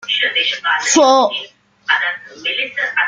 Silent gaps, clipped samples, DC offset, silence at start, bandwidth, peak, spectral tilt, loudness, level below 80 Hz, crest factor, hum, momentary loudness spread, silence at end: none; under 0.1%; under 0.1%; 0 s; 10 kHz; 0 dBFS; 0 dB/octave; -15 LUFS; -66 dBFS; 16 dB; none; 13 LU; 0 s